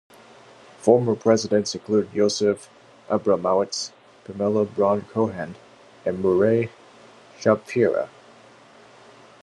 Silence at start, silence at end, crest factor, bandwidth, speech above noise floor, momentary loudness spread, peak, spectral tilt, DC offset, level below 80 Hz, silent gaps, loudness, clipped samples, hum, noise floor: 0.8 s; 1.35 s; 22 dB; 11 kHz; 28 dB; 12 LU; -2 dBFS; -5.5 dB/octave; under 0.1%; -70 dBFS; none; -22 LUFS; under 0.1%; none; -50 dBFS